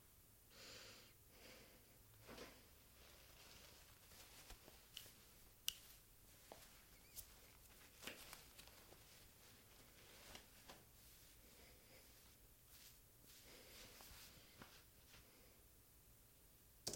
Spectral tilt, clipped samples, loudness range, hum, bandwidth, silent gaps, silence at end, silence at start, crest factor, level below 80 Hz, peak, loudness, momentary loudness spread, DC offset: -1.5 dB/octave; under 0.1%; 7 LU; none; 16.5 kHz; none; 0 s; 0 s; 40 dB; -74 dBFS; -22 dBFS; -61 LUFS; 9 LU; under 0.1%